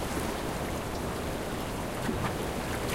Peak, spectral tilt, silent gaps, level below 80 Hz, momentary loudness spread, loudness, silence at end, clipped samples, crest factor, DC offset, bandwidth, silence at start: -18 dBFS; -5 dB/octave; none; -42 dBFS; 2 LU; -33 LUFS; 0 s; under 0.1%; 14 dB; under 0.1%; 16 kHz; 0 s